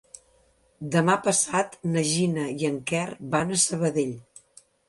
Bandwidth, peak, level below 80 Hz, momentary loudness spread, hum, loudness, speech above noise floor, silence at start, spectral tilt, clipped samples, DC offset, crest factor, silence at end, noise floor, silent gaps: 11.5 kHz; -8 dBFS; -62 dBFS; 7 LU; none; -25 LUFS; 38 dB; 0.8 s; -4 dB/octave; under 0.1%; under 0.1%; 18 dB; 0.7 s; -63 dBFS; none